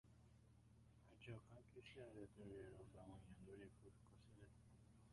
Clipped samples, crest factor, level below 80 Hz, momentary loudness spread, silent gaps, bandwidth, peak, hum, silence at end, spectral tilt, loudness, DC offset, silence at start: under 0.1%; 18 dB; -74 dBFS; 9 LU; none; 11 kHz; -44 dBFS; none; 0 s; -6.5 dB/octave; -63 LUFS; under 0.1%; 0.05 s